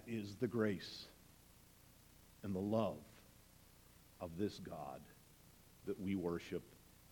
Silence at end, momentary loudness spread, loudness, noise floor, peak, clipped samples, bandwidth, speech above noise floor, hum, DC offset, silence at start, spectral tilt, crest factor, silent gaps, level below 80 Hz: 0 s; 25 LU; -44 LUFS; -65 dBFS; -24 dBFS; under 0.1%; 19 kHz; 23 dB; none; under 0.1%; 0 s; -6.5 dB/octave; 20 dB; none; -70 dBFS